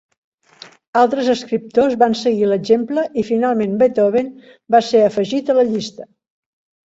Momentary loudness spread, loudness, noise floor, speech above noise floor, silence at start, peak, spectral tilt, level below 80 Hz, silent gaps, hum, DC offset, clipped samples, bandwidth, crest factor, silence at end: 6 LU; -16 LUFS; -44 dBFS; 28 dB; 0.95 s; -2 dBFS; -5.5 dB/octave; -60 dBFS; none; none; under 0.1%; under 0.1%; 8 kHz; 16 dB; 0.85 s